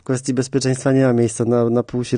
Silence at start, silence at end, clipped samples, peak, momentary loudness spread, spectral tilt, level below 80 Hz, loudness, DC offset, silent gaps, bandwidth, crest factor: 0.1 s; 0 s; under 0.1%; -6 dBFS; 5 LU; -6.5 dB/octave; -54 dBFS; -18 LUFS; under 0.1%; none; 10 kHz; 12 dB